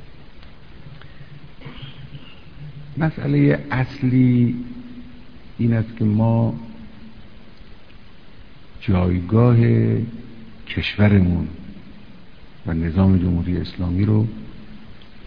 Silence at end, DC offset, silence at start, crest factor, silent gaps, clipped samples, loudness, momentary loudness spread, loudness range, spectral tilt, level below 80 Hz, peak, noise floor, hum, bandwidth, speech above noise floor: 0 s; 1%; 0 s; 18 dB; none; under 0.1%; -19 LUFS; 25 LU; 6 LU; -10.5 dB/octave; -40 dBFS; -2 dBFS; -45 dBFS; none; 5.4 kHz; 27 dB